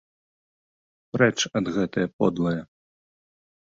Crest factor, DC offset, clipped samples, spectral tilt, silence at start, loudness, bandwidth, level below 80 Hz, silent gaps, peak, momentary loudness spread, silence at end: 22 dB; under 0.1%; under 0.1%; -5 dB/octave; 1.15 s; -25 LUFS; 7.8 kHz; -58 dBFS; 2.13-2.19 s; -6 dBFS; 8 LU; 1 s